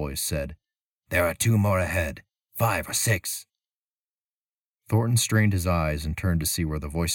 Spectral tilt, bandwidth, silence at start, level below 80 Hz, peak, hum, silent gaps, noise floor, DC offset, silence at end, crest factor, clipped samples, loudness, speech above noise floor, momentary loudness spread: -4.5 dB/octave; 19 kHz; 0 s; -40 dBFS; -10 dBFS; none; 0.81-1.02 s, 3.71-4.15 s, 4.21-4.78 s; under -90 dBFS; under 0.1%; 0 s; 16 dB; under 0.1%; -25 LUFS; over 66 dB; 10 LU